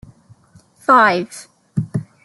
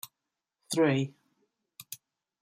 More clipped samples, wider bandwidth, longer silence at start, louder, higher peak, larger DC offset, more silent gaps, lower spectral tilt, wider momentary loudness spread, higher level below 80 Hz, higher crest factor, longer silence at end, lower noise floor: neither; second, 12 kHz vs 16 kHz; first, 0.9 s vs 0.05 s; first, -16 LUFS vs -29 LUFS; first, -2 dBFS vs -14 dBFS; neither; neither; about the same, -5.5 dB/octave vs -5.5 dB/octave; second, 18 LU vs 21 LU; first, -58 dBFS vs -74 dBFS; about the same, 18 dB vs 20 dB; second, 0.25 s vs 0.45 s; second, -51 dBFS vs -87 dBFS